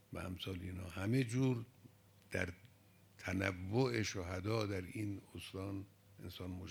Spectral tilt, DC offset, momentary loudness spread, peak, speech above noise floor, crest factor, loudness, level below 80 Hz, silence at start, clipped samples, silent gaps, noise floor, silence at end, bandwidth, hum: -6 dB/octave; under 0.1%; 13 LU; -20 dBFS; 26 dB; 22 dB; -41 LUFS; -72 dBFS; 0.1 s; under 0.1%; none; -66 dBFS; 0 s; 20 kHz; none